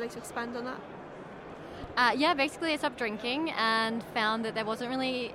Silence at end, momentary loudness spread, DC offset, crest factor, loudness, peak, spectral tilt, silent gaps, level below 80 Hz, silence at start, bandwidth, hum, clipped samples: 0 s; 18 LU; under 0.1%; 20 dB; -30 LUFS; -12 dBFS; -3.5 dB/octave; none; -62 dBFS; 0 s; 16 kHz; none; under 0.1%